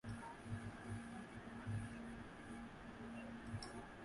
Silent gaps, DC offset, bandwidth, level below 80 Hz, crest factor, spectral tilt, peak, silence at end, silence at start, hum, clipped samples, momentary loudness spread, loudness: none; under 0.1%; 11.5 kHz; -64 dBFS; 16 dB; -6 dB/octave; -36 dBFS; 0 s; 0.05 s; none; under 0.1%; 6 LU; -51 LUFS